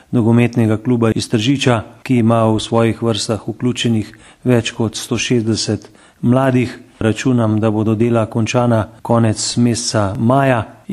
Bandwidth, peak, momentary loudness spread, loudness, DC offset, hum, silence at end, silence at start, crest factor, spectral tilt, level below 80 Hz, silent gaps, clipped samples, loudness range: 12.5 kHz; 0 dBFS; 7 LU; -16 LUFS; under 0.1%; none; 0 s; 0.1 s; 16 dB; -5.5 dB/octave; -46 dBFS; none; under 0.1%; 2 LU